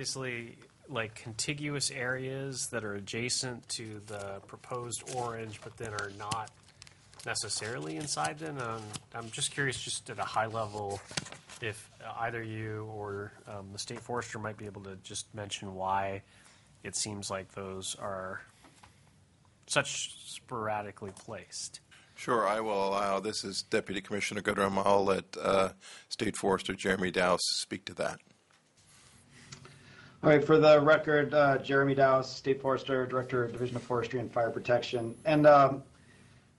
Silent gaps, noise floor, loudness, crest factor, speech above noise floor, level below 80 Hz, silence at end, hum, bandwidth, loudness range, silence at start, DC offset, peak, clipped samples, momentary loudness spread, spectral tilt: none; -66 dBFS; -31 LUFS; 22 dB; 34 dB; -66 dBFS; 0.75 s; none; 11.5 kHz; 12 LU; 0 s; under 0.1%; -10 dBFS; under 0.1%; 17 LU; -4 dB/octave